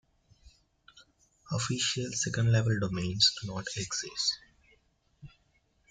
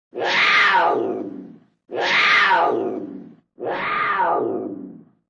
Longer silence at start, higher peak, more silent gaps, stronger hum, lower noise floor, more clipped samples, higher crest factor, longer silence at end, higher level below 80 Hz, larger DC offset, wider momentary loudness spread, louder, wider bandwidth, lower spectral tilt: first, 0.95 s vs 0.15 s; second, -10 dBFS vs -6 dBFS; neither; neither; first, -71 dBFS vs -40 dBFS; neither; first, 22 dB vs 16 dB; first, 0.6 s vs 0.3 s; first, -60 dBFS vs -66 dBFS; neither; second, 11 LU vs 18 LU; second, -30 LUFS vs -18 LUFS; about the same, 9.6 kHz vs 10.5 kHz; about the same, -3.5 dB/octave vs -3 dB/octave